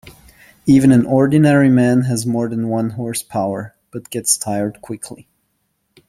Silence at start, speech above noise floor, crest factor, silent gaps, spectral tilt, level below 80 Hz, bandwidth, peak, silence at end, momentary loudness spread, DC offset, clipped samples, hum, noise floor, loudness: 0.05 s; 53 dB; 16 dB; none; -6 dB/octave; -50 dBFS; 15.5 kHz; -2 dBFS; 0.95 s; 18 LU; under 0.1%; under 0.1%; none; -68 dBFS; -15 LUFS